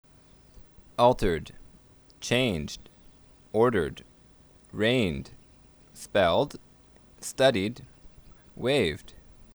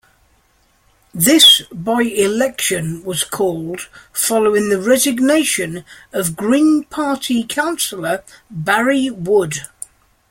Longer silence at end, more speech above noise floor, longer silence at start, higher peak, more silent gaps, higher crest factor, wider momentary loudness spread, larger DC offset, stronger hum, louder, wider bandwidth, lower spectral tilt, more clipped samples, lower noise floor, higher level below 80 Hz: second, 0.35 s vs 0.65 s; second, 31 dB vs 41 dB; second, 1 s vs 1.15 s; second, -8 dBFS vs 0 dBFS; neither; first, 22 dB vs 16 dB; first, 20 LU vs 13 LU; neither; neither; second, -27 LUFS vs -15 LUFS; first, over 20 kHz vs 16.5 kHz; first, -5 dB/octave vs -3 dB/octave; neither; about the same, -56 dBFS vs -57 dBFS; first, -48 dBFS vs -54 dBFS